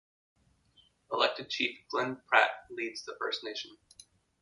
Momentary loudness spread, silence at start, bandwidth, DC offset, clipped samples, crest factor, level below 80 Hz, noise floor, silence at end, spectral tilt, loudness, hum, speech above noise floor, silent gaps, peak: 13 LU; 1.1 s; 11.5 kHz; under 0.1%; under 0.1%; 28 dB; -78 dBFS; -67 dBFS; 0.65 s; -2.5 dB/octave; -32 LUFS; none; 34 dB; none; -8 dBFS